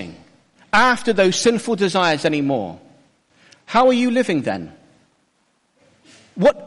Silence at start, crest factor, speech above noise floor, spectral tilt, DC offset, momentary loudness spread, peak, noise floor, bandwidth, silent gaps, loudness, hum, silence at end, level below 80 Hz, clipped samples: 0 s; 14 dB; 47 dB; -4.5 dB/octave; under 0.1%; 15 LU; -6 dBFS; -65 dBFS; 11.5 kHz; none; -18 LUFS; none; 0 s; -54 dBFS; under 0.1%